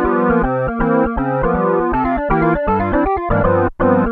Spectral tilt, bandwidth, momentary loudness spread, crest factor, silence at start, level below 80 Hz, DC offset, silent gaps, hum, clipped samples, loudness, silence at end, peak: -11 dB/octave; 4.6 kHz; 3 LU; 14 dB; 0 s; -28 dBFS; under 0.1%; none; none; under 0.1%; -16 LUFS; 0 s; -2 dBFS